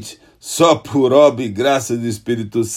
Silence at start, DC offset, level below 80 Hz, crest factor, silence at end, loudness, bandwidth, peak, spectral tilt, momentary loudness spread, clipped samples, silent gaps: 0 s; under 0.1%; -56 dBFS; 16 dB; 0 s; -15 LUFS; 15.5 kHz; 0 dBFS; -5 dB/octave; 13 LU; under 0.1%; none